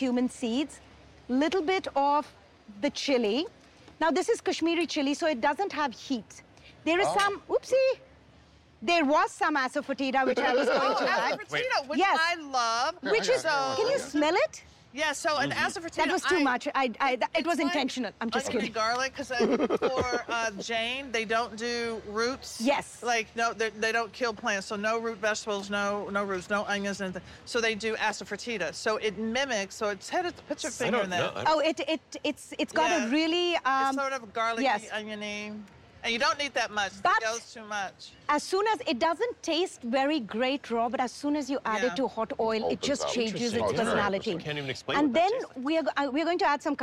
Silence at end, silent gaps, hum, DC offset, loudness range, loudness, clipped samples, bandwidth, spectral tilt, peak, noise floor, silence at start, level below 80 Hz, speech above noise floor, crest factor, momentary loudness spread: 0 s; none; none; under 0.1%; 3 LU; -28 LUFS; under 0.1%; 15 kHz; -3.5 dB/octave; -16 dBFS; -57 dBFS; 0 s; -62 dBFS; 29 dB; 12 dB; 8 LU